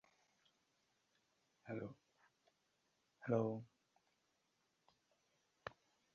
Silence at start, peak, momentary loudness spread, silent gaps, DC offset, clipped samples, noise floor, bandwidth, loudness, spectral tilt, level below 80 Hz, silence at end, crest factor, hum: 1.65 s; -26 dBFS; 19 LU; none; under 0.1%; under 0.1%; -84 dBFS; 7.2 kHz; -45 LUFS; -7.5 dB/octave; -86 dBFS; 0.45 s; 26 dB; none